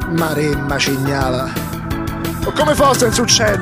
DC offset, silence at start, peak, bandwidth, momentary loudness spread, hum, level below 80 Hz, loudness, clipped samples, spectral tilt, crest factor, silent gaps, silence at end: under 0.1%; 0 s; 0 dBFS; 16 kHz; 11 LU; none; -32 dBFS; -16 LUFS; under 0.1%; -4 dB/octave; 16 dB; none; 0 s